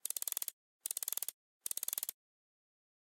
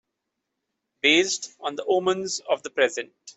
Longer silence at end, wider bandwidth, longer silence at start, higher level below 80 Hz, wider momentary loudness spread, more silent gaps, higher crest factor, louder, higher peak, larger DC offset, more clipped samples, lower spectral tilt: first, 1 s vs 0.05 s; first, 17 kHz vs 8.4 kHz; second, 0.05 s vs 1.05 s; second, under -90 dBFS vs -70 dBFS; second, 7 LU vs 12 LU; first, 0.53-0.80 s, 1.34-1.60 s vs none; first, 30 dB vs 20 dB; second, -40 LUFS vs -23 LUFS; second, -14 dBFS vs -6 dBFS; neither; neither; second, 4 dB/octave vs -2 dB/octave